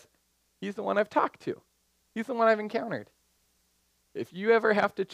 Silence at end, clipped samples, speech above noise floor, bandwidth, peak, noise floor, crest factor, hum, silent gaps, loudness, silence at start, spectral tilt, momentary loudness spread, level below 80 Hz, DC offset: 0 s; under 0.1%; 44 dB; 12.5 kHz; -10 dBFS; -72 dBFS; 20 dB; none; none; -28 LUFS; 0.6 s; -6 dB/octave; 16 LU; -76 dBFS; under 0.1%